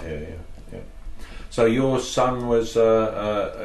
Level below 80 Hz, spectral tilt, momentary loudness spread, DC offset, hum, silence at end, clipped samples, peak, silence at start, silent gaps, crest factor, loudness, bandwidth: -40 dBFS; -5.5 dB/octave; 22 LU; under 0.1%; none; 0 s; under 0.1%; -8 dBFS; 0 s; none; 14 dB; -21 LUFS; 12 kHz